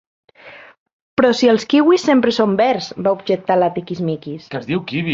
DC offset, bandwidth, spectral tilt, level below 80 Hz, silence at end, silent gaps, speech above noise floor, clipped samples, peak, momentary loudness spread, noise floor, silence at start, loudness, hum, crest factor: under 0.1%; 7.8 kHz; -6 dB/octave; -58 dBFS; 0 s; 0.78-0.86 s, 0.93-1.17 s; 25 dB; under 0.1%; -2 dBFS; 10 LU; -41 dBFS; 0.45 s; -16 LUFS; none; 14 dB